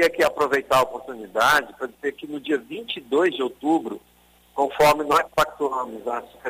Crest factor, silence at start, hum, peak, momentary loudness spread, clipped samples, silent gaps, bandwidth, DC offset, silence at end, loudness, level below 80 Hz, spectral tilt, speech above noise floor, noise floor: 16 dB; 0 s; none; -6 dBFS; 13 LU; under 0.1%; none; 16 kHz; under 0.1%; 0 s; -22 LUFS; -56 dBFS; -3.5 dB/octave; 32 dB; -54 dBFS